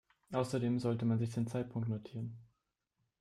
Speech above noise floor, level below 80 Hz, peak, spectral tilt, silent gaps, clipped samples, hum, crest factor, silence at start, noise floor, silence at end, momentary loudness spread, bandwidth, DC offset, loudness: 49 dB; -72 dBFS; -20 dBFS; -8 dB/octave; none; under 0.1%; none; 16 dB; 0.3 s; -84 dBFS; 0.75 s; 11 LU; 12 kHz; under 0.1%; -37 LUFS